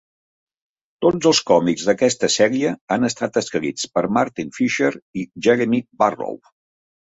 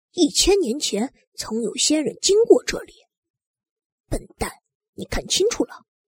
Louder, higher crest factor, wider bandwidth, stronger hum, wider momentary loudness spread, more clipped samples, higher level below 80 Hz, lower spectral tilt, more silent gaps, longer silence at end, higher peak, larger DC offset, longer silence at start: about the same, -19 LUFS vs -20 LUFS; about the same, 18 dB vs 20 dB; second, 8.2 kHz vs 16.5 kHz; neither; second, 8 LU vs 16 LU; neither; second, -60 dBFS vs -40 dBFS; first, -4 dB/octave vs -2.5 dB/octave; second, 2.81-2.87 s, 5.02-5.13 s vs 1.27-1.32 s, 3.17-3.23 s, 3.30-3.34 s, 3.47-3.54 s, 3.71-3.76 s, 3.85-4.04 s, 4.75-4.80 s, 4.89-4.93 s; first, 0.7 s vs 0.3 s; about the same, -2 dBFS vs -2 dBFS; neither; first, 1 s vs 0.15 s